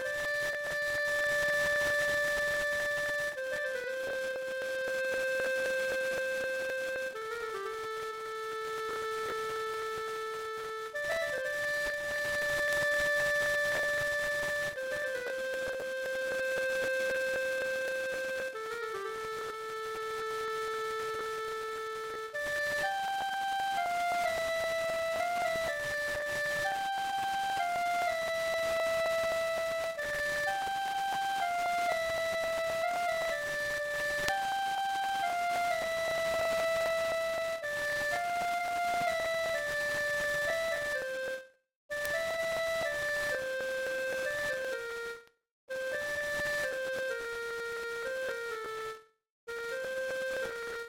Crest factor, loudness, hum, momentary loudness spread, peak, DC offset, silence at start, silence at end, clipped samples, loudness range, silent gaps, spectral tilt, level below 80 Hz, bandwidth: 26 dB; -33 LUFS; none; 8 LU; -8 dBFS; under 0.1%; 0 s; 0 s; under 0.1%; 6 LU; 41.76-41.89 s, 45.51-45.68 s, 49.30-49.47 s; -1.5 dB/octave; -62 dBFS; 16.5 kHz